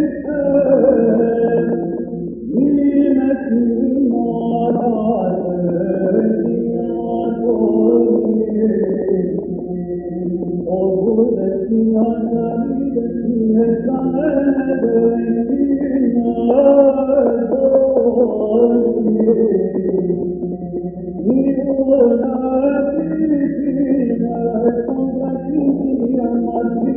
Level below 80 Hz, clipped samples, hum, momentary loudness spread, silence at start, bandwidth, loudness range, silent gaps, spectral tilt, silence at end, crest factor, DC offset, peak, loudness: -44 dBFS; under 0.1%; none; 8 LU; 0 s; 3.4 kHz; 4 LU; none; -13.5 dB/octave; 0 s; 14 dB; under 0.1%; 0 dBFS; -16 LUFS